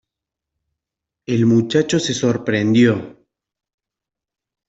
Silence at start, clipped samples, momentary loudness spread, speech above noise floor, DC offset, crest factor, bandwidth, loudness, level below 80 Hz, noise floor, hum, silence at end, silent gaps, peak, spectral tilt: 1.3 s; under 0.1%; 9 LU; 70 dB; under 0.1%; 16 dB; 8 kHz; -17 LUFS; -58 dBFS; -86 dBFS; none; 1.55 s; none; -4 dBFS; -5.5 dB/octave